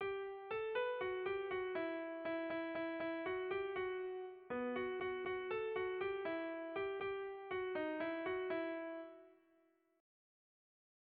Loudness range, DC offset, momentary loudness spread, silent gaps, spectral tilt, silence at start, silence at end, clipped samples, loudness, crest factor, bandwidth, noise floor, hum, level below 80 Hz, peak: 3 LU; under 0.1%; 5 LU; none; -2.5 dB/octave; 0 s; 1.65 s; under 0.1%; -43 LUFS; 14 dB; 4.8 kHz; -76 dBFS; none; -76 dBFS; -30 dBFS